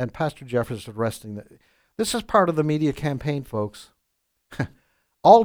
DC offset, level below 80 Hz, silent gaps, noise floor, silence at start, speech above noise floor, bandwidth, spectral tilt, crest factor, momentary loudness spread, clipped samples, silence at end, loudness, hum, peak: under 0.1%; -52 dBFS; none; -75 dBFS; 0 s; 50 dB; over 20 kHz; -6 dB/octave; 22 dB; 16 LU; under 0.1%; 0 s; -24 LUFS; none; 0 dBFS